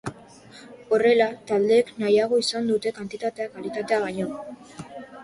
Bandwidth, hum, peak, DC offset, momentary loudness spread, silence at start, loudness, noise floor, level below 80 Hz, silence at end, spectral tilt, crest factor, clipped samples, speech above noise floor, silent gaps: 11.5 kHz; none; -6 dBFS; under 0.1%; 20 LU; 0.05 s; -23 LUFS; -47 dBFS; -64 dBFS; 0 s; -4.5 dB/octave; 18 dB; under 0.1%; 24 dB; none